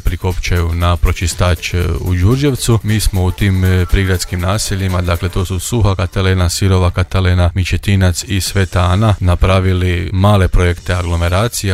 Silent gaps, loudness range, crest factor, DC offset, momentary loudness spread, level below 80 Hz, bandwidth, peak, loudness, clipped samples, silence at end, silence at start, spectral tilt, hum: none; 2 LU; 12 dB; under 0.1%; 4 LU; -22 dBFS; 15.5 kHz; 0 dBFS; -14 LUFS; under 0.1%; 0 s; 0.05 s; -5.5 dB/octave; none